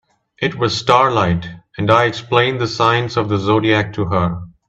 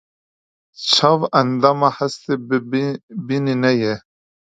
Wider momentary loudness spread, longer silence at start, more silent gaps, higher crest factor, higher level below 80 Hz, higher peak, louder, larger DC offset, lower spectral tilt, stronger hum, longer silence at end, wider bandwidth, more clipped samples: about the same, 9 LU vs 10 LU; second, 0.4 s vs 0.8 s; second, none vs 3.03-3.08 s; about the same, 16 dB vs 20 dB; first, -48 dBFS vs -64 dBFS; about the same, 0 dBFS vs 0 dBFS; about the same, -16 LUFS vs -18 LUFS; neither; about the same, -6 dB/octave vs -5 dB/octave; neither; second, 0.2 s vs 0.6 s; about the same, 8.4 kHz vs 9.2 kHz; neither